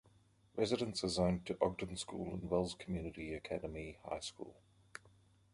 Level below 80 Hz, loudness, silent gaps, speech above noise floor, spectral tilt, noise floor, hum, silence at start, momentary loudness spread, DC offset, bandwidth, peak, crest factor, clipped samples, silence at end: -58 dBFS; -40 LUFS; none; 30 dB; -5 dB/octave; -69 dBFS; none; 0.55 s; 18 LU; under 0.1%; 11.5 kHz; -18 dBFS; 24 dB; under 0.1%; 0.45 s